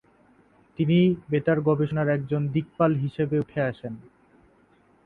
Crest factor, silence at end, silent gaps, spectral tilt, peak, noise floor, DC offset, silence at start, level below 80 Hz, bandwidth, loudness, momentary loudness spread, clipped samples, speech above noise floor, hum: 18 dB; 1.05 s; none; -10.5 dB/octave; -8 dBFS; -60 dBFS; under 0.1%; 0.8 s; -58 dBFS; 4.3 kHz; -24 LUFS; 12 LU; under 0.1%; 36 dB; none